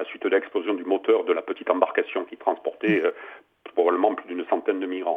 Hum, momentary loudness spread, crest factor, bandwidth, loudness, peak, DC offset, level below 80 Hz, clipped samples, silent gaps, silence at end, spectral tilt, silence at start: none; 8 LU; 22 dB; 3.8 kHz; -25 LUFS; -2 dBFS; under 0.1%; -80 dBFS; under 0.1%; none; 0 s; -7.5 dB/octave; 0 s